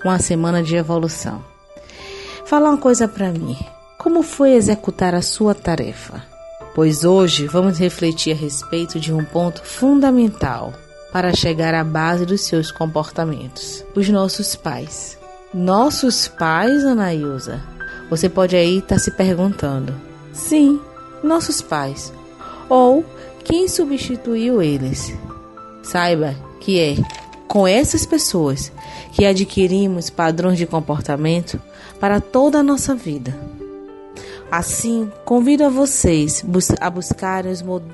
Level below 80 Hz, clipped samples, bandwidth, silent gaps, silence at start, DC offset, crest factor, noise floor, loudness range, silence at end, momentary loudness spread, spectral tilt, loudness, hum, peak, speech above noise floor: -40 dBFS; under 0.1%; 12 kHz; none; 0 s; under 0.1%; 16 dB; -40 dBFS; 3 LU; 0 s; 17 LU; -5 dB/octave; -17 LUFS; none; -2 dBFS; 24 dB